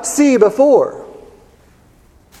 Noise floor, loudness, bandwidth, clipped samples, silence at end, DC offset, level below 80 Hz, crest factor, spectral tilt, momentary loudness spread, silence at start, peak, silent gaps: -48 dBFS; -12 LUFS; 14.5 kHz; under 0.1%; 1.35 s; under 0.1%; -52 dBFS; 16 dB; -4.5 dB/octave; 12 LU; 0 s; 0 dBFS; none